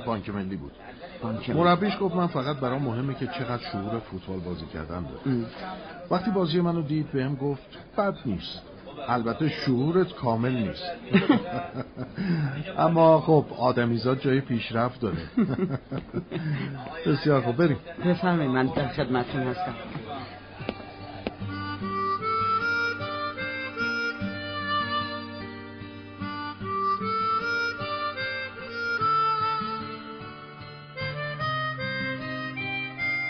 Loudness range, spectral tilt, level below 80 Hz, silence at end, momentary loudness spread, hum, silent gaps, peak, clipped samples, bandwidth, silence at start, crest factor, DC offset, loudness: 7 LU; -5 dB/octave; -54 dBFS; 0 s; 14 LU; none; none; -8 dBFS; under 0.1%; 6.2 kHz; 0 s; 20 dB; under 0.1%; -27 LUFS